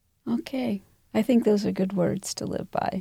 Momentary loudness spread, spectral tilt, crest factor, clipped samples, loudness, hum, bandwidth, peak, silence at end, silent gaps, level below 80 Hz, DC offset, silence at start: 9 LU; -6 dB/octave; 16 dB; under 0.1%; -27 LUFS; none; 16 kHz; -10 dBFS; 0 s; none; -58 dBFS; under 0.1%; 0.25 s